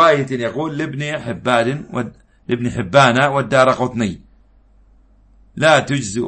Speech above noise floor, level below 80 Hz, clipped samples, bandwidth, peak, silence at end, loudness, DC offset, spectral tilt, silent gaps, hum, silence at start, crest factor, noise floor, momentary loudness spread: 34 dB; -48 dBFS; under 0.1%; 8.8 kHz; 0 dBFS; 0 s; -17 LUFS; under 0.1%; -5 dB/octave; none; none; 0 s; 16 dB; -50 dBFS; 13 LU